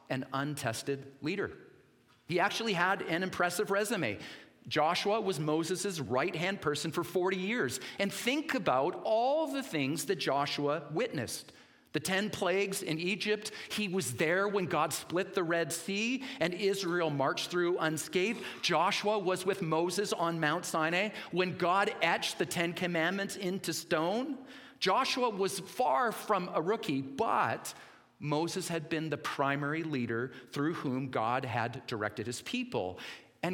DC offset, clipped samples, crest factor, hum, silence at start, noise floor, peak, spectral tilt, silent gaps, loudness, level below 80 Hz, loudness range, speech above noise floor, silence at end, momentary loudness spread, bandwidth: under 0.1%; under 0.1%; 20 dB; none; 0.1 s; -65 dBFS; -14 dBFS; -4 dB/octave; none; -33 LUFS; -76 dBFS; 3 LU; 32 dB; 0 s; 7 LU; 18 kHz